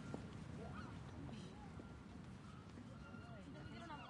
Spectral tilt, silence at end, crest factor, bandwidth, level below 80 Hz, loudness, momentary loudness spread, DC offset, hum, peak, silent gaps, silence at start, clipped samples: -6.5 dB/octave; 0 s; 20 dB; 11 kHz; -66 dBFS; -55 LUFS; 5 LU; under 0.1%; none; -34 dBFS; none; 0 s; under 0.1%